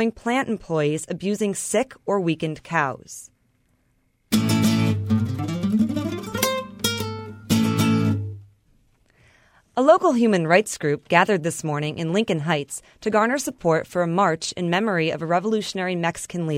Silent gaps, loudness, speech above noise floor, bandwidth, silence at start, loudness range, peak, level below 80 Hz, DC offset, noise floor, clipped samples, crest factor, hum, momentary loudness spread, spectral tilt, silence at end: none; -22 LUFS; 44 dB; 16 kHz; 0 s; 5 LU; -2 dBFS; -56 dBFS; under 0.1%; -66 dBFS; under 0.1%; 20 dB; none; 9 LU; -5 dB/octave; 0 s